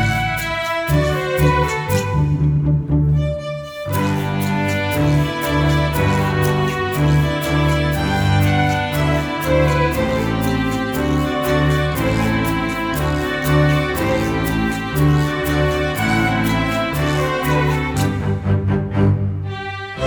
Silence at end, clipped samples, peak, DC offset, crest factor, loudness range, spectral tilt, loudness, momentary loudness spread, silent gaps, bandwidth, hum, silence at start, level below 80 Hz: 0 s; under 0.1%; -4 dBFS; under 0.1%; 14 dB; 2 LU; -6 dB/octave; -18 LUFS; 4 LU; none; over 20 kHz; none; 0 s; -30 dBFS